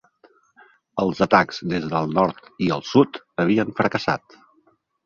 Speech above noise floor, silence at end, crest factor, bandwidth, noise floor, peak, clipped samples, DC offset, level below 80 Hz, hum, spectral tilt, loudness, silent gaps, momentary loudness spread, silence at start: 42 dB; 0.9 s; 22 dB; 7.4 kHz; -63 dBFS; 0 dBFS; under 0.1%; under 0.1%; -56 dBFS; none; -6.5 dB/octave; -21 LUFS; none; 8 LU; 0.95 s